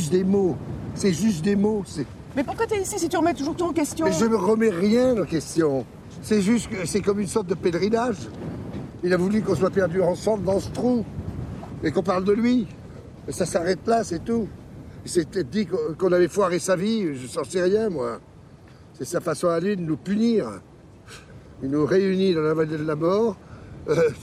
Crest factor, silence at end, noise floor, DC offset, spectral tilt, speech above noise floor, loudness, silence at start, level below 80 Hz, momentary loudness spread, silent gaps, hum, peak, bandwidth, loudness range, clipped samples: 14 dB; 0 s; -47 dBFS; under 0.1%; -6 dB/octave; 24 dB; -23 LUFS; 0 s; -50 dBFS; 14 LU; none; none; -10 dBFS; 14.5 kHz; 4 LU; under 0.1%